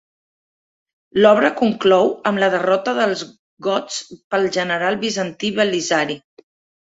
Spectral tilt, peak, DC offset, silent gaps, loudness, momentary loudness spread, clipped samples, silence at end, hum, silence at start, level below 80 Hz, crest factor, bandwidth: -4 dB/octave; -2 dBFS; under 0.1%; 3.39-3.57 s, 4.24-4.31 s; -18 LUFS; 12 LU; under 0.1%; 0.7 s; none; 1.15 s; -62 dBFS; 18 dB; 8 kHz